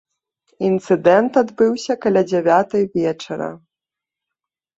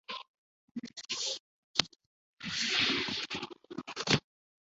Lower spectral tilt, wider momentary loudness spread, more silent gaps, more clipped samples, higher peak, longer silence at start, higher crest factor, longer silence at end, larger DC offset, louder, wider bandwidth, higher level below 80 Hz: first, -6.5 dB/octave vs -1.5 dB/octave; second, 11 LU vs 17 LU; second, none vs 0.28-0.75 s, 1.40-1.74 s, 2.06-2.37 s; neither; about the same, -2 dBFS vs -2 dBFS; first, 0.6 s vs 0.1 s; second, 18 dB vs 36 dB; first, 1.2 s vs 0.5 s; neither; first, -17 LUFS vs -33 LUFS; about the same, 8 kHz vs 8 kHz; about the same, -62 dBFS vs -66 dBFS